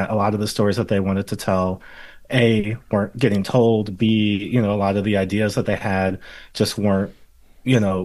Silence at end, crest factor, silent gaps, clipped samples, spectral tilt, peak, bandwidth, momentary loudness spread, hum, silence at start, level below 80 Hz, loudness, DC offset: 0 s; 18 dB; none; under 0.1%; -6.5 dB/octave; -2 dBFS; 12.5 kHz; 6 LU; none; 0 s; -48 dBFS; -20 LUFS; under 0.1%